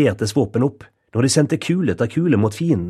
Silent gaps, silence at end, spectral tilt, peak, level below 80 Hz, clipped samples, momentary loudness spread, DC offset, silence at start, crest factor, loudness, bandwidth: none; 0 s; -6 dB/octave; -2 dBFS; -50 dBFS; under 0.1%; 5 LU; under 0.1%; 0 s; 16 dB; -19 LUFS; 13.5 kHz